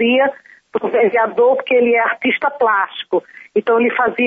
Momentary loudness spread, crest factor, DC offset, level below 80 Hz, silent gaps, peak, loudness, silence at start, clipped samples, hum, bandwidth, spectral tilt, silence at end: 8 LU; 12 dB; under 0.1%; -64 dBFS; none; -4 dBFS; -16 LUFS; 0 s; under 0.1%; none; 3.8 kHz; -7 dB/octave; 0 s